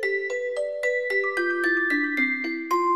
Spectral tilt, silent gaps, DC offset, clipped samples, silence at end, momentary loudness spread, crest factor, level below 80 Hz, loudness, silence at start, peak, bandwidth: -2.5 dB/octave; none; 0.2%; under 0.1%; 0 s; 5 LU; 12 dB; -78 dBFS; -24 LUFS; 0 s; -12 dBFS; 15.5 kHz